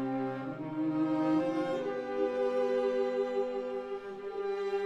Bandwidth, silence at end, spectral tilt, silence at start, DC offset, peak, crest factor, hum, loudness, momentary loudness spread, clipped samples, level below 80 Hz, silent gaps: 8.8 kHz; 0 s; -7.5 dB/octave; 0 s; under 0.1%; -20 dBFS; 14 dB; none; -33 LUFS; 8 LU; under 0.1%; -72 dBFS; none